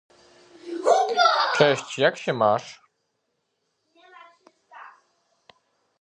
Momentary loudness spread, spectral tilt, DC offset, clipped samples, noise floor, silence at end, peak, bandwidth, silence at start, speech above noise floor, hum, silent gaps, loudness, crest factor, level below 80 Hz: 15 LU; -4 dB/octave; under 0.1%; under 0.1%; -76 dBFS; 1.15 s; -2 dBFS; 10.5 kHz; 0.65 s; 54 dB; none; none; -21 LUFS; 24 dB; -76 dBFS